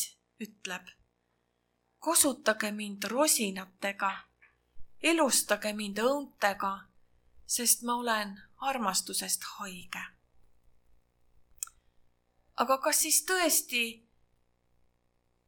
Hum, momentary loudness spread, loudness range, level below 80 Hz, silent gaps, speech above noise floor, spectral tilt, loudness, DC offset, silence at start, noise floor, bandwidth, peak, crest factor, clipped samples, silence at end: 60 Hz at -60 dBFS; 16 LU; 6 LU; -68 dBFS; none; 46 dB; -1 dB/octave; -29 LUFS; under 0.1%; 0 s; -77 dBFS; 19 kHz; -10 dBFS; 22 dB; under 0.1%; 1.5 s